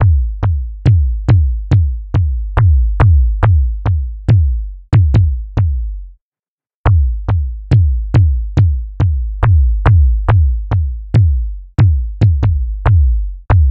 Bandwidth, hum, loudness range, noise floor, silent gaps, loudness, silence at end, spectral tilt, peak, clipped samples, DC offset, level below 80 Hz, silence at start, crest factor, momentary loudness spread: 5 kHz; none; 3 LU; under -90 dBFS; 6.21-6.32 s, 6.39-6.58 s, 6.74-6.84 s; -14 LUFS; 0 s; -9.5 dB/octave; 0 dBFS; under 0.1%; under 0.1%; -16 dBFS; 0 s; 12 dB; 6 LU